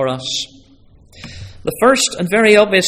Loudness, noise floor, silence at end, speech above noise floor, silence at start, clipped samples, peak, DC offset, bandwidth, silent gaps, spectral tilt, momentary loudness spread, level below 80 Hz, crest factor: -14 LUFS; -46 dBFS; 0 s; 33 dB; 0 s; under 0.1%; 0 dBFS; under 0.1%; 16 kHz; none; -3 dB/octave; 23 LU; -46 dBFS; 16 dB